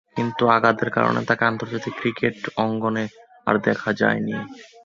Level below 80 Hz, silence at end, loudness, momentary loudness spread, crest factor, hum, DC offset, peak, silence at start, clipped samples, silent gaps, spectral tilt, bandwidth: -60 dBFS; 0.2 s; -22 LUFS; 11 LU; 20 dB; none; under 0.1%; -2 dBFS; 0.15 s; under 0.1%; none; -6.5 dB/octave; 7.4 kHz